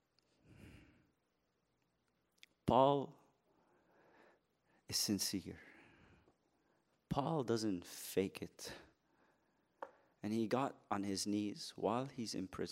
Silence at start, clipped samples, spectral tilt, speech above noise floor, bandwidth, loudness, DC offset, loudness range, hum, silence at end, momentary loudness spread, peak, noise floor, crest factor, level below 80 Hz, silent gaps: 0.5 s; under 0.1%; -4.5 dB/octave; 44 dB; 16 kHz; -39 LUFS; under 0.1%; 5 LU; none; 0 s; 18 LU; -18 dBFS; -83 dBFS; 26 dB; -70 dBFS; none